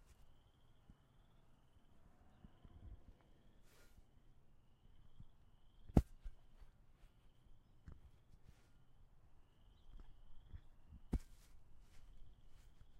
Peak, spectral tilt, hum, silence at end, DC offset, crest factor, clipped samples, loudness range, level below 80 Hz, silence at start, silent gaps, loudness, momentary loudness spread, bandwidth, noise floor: -14 dBFS; -8.5 dB/octave; none; 0 s; under 0.1%; 38 dB; under 0.1%; 21 LU; -54 dBFS; 0 s; none; -42 LUFS; 30 LU; 15 kHz; -69 dBFS